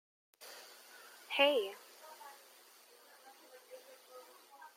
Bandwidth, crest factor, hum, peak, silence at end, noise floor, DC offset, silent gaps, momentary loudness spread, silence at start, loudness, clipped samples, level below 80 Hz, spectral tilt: 16.5 kHz; 26 dB; none; -16 dBFS; 0.1 s; -62 dBFS; under 0.1%; none; 28 LU; 0.4 s; -33 LUFS; under 0.1%; under -90 dBFS; -0.5 dB/octave